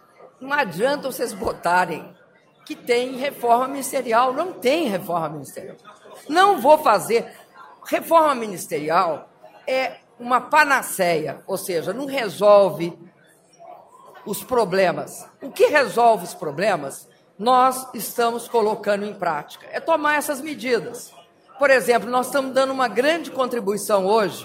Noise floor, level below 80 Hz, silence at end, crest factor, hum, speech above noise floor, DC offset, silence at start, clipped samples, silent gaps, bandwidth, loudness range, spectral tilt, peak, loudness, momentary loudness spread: -53 dBFS; -64 dBFS; 0 s; 20 dB; none; 33 dB; under 0.1%; 0.2 s; under 0.1%; none; 16 kHz; 3 LU; -3.5 dB/octave; -2 dBFS; -20 LUFS; 16 LU